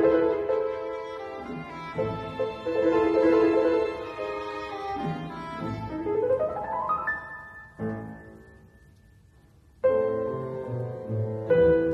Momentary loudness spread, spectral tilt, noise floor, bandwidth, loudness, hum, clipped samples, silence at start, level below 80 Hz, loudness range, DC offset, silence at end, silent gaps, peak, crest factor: 15 LU; -8 dB/octave; -56 dBFS; 7.2 kHz; -27 LUFS; none; under 0.1%; 0 s; -54 dBFS; 6 LU; under 0.1%; 0 s; none; -12 dBFS; 16 dB